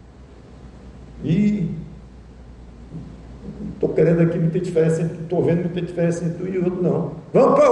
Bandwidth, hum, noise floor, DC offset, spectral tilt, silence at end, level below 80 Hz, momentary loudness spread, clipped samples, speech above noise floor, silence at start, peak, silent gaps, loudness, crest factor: 9.2 kHz; none; -43 dBFS; under 0.1%; -8.5 dB/octave; 0 s; -44 dBFS; 21 LU; under 0.1%; 25 dB; 0.1 s; -6 dBFS; none; -20 LUFS; 14 dB